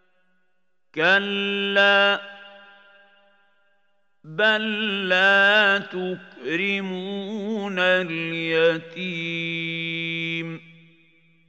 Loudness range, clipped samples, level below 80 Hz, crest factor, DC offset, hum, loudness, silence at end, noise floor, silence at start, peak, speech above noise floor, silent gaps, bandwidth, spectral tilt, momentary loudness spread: 4 LU; under 0.1%; -84 dBFS; 20 dB; under 0.1%; none; -21 LUFS; 0.9 s; -75 dBFS; 0.95 s; -4 dBFS; 53 dB; none; 8.2 kHz; -5 dB/octave; 14 LU